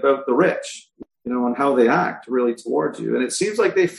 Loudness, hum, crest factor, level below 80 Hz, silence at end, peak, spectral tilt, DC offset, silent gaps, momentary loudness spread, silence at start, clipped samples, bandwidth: -20 LUFS; none; 16 dB; -66 dBFS; 0 s; -4 dBFS; -4.5 dB/octave; under 0.1%; none; 11 LU; 0 s; under 0.1%; 12 kHz